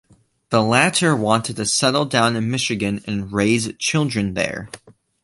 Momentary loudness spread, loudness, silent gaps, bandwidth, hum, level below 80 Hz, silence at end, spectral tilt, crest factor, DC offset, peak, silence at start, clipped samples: 8 LU; -19 LUFS; none; 11.5 kHz; none; -50 dBFS; 0.3 s; -4 dB/octave; 18 dB; under 0.1%; -2 dBFS; 0.5 s; under 0.1%